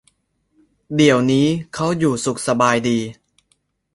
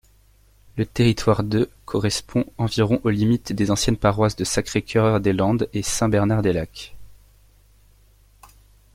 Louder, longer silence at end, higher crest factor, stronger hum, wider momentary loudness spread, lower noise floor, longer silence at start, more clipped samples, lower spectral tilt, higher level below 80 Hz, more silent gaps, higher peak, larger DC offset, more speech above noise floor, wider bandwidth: first, -18 LUFS vs -21 LUFS; second, 0.8 s vs 1.8 s; about the same, 18 dB vs 18 dB; neither; about the same, 8 LU vs 7 LU; first, -66 dBFS vs -55 dBFS; first, 0.9 s vs 0.75 s; neither; about the same, -5 dB/octave vs -5.5 dB/octave; second, -54 dBFS vs -42 dBFS; neither; about the same, -2 dBFS vs -4 dBFS; neither; first, 49 dB vs 34 dB; second, 11.5 kHz vs 16 kHz